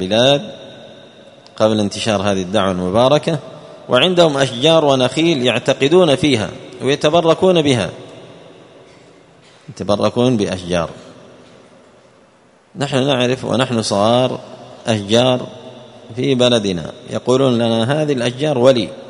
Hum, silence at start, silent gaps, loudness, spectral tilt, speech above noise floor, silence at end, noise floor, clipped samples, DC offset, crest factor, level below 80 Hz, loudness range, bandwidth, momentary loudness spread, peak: none; 0 s; none; -15 LUFS; -5 dB/octave; 35 dB; 0 s; -50 dBFS; under 0.1%; under 0.1%; 16 dB; -52 dBFS; 7 LU; 11 kHz; 13 LU; 0 dBFS